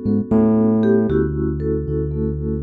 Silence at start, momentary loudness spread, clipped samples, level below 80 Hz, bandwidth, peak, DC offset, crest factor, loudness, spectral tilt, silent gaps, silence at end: 0 s; 7 LU; under 0.1%; -32 dBFS; 4.1 kHz; -4 dBFS; under 0.1%; 14 dB; -18 LUFS; -12 dB/octave; none; 0 s